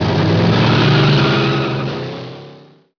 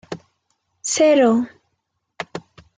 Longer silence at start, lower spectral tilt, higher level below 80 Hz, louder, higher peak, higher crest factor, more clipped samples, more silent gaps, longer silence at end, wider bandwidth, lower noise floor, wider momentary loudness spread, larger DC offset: about the same, 0 s vs 0.1 s; first, -7 dB/octave vs -3.5 dB/octave; first, -42 dBFS vs -66 dBFS; first, -14 LUFS vs -17 LUFS; first, -2 dBFS vs -6 dBFS; about the same, 14 dB vs 16 dB; neither; neither; about the same, 0.4 s vs 0.4 s; second, 5.4 kHz vs 9.6 kHz; second, -42 dBFS vs -74 dBFS; second, 15 LU vs 22 LU; neither